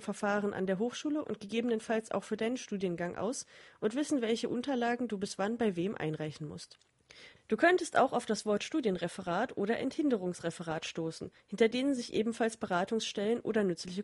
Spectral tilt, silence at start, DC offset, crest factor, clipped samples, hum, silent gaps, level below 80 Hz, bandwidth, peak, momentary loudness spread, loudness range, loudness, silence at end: -5 dB/octave; 0 s; under 0.1%; 20 dB; under 0.1%; none; none; -72 dBFS; 11.5 kHz; -14 dBFS; 9 LU; 3 LU; -33 LUFS; 0 s